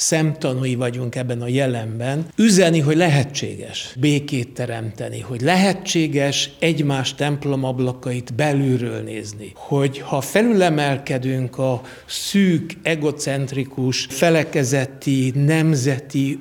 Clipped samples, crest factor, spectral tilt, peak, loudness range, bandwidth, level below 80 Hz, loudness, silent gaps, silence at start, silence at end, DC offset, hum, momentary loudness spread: under 0.1%; 18 dB; -5 dB/octave; -2 dBFS; 3 LU; 18 kHz; -56 dBFS; -20 LUFS; none; 0 s; 0 s; under 0.1%; none; 10 LU